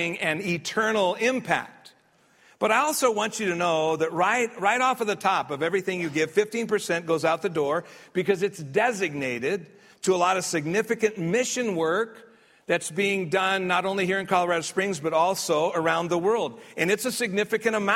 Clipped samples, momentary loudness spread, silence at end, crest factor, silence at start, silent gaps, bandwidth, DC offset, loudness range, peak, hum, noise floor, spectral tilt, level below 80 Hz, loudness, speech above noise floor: under 0.1%; 5 LU; 0 s; 18 dB; 0 s; none; 16 kHz; under 0.1%; 2 LU; -6 dBFS; none; -61 dBFS; -4 dB/octave; -70 dBFS; -25 LUFS; 36 dB